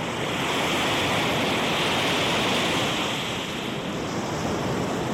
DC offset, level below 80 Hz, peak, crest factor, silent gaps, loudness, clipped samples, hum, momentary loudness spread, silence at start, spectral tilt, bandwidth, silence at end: under 0.1%; -50 dBFS; -14 dBFS; 10 dB; none; -24 LUFS; under 0.1%; none; 7 LU; 0 s; -3.5 dB/octave; 16.5 kHz; 0 s